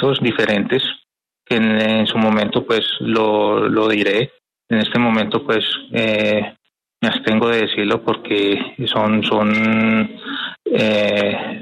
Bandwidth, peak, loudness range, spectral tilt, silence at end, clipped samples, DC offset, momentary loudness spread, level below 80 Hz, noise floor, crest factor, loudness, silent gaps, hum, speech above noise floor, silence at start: 9 kHz; -4 dBFS; 2 LU; -6.5 dB/octave; 0 s; under 0.1%; under 0.1%; 6 LU; -58 dBFS; -58 dBFS; 14 dB; -17 LUFS; none; none; 41 dB; 0 s